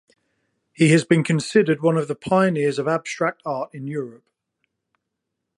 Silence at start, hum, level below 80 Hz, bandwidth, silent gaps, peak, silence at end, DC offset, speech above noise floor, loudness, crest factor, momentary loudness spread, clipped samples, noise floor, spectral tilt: 0.8 s; none; -64 dBFS; 11.5 kHz; none; -4 dBFS; 1.45 s; under 0.1%; 60 dB; -21 LUFS; 18 dB; 12 LU; under 0.1%; -80 dBFS; -6 dB/octave